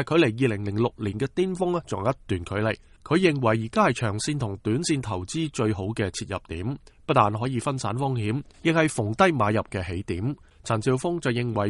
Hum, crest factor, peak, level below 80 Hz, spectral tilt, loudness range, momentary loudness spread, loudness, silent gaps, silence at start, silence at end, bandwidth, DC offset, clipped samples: none; 20 dB; -4 dBFS; -50 dBFS; -6 dB/octave; 2 LU; 9 LU; -26 LUFS; none; 0 s; 0 s; 11.5 kHz; under 0.1%; under 0.1%